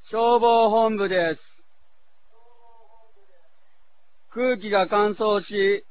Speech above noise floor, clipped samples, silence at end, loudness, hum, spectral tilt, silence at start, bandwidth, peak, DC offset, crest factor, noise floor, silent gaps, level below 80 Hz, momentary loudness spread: 48 dB; under 0.1%; 0.1 s; -21 LUFS; none; -8.5 dB/octave; 0.1 s; 4 kHz; -8 dBFS; 0.8%; 16 dB; -68 dBFS; none; -64 dBFS; 9 LU